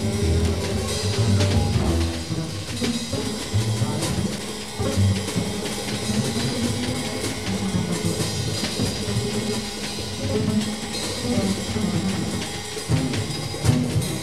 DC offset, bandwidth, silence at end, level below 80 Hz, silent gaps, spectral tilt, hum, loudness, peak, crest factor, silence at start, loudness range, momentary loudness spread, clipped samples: 0.8%; 15 kHz; 0 s; -38 dBFS; none; -5 dB/octave; none; -24 LUFS; -6 dBFS; 18 dB; 0 s; 2 LU; 6 LU; under 0.1%